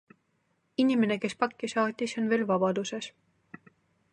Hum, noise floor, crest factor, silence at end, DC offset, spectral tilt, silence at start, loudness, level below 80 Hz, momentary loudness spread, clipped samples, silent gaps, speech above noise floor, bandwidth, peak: none; -74 dBFS; 20 dB; 1.05 s; under 0.1%; -5 dB/octave; 0.8 s; -29 LUFS; -78 dBFS; 11 LU; under 0.1%; none; 46 dB; 10 kHz; -10 dBFS